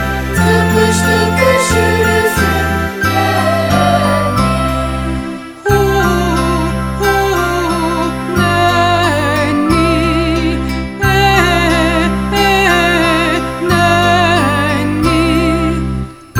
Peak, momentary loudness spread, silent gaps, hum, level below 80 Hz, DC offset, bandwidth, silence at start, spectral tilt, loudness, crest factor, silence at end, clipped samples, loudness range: 0 dBFS; 6 LU; none; none; -24 dBFS; under 0.1%; 18 kHz; 0 s; -5 dB/octave; -12 LUFS; 12 dB; 0 s; under 0.1%; 3 LU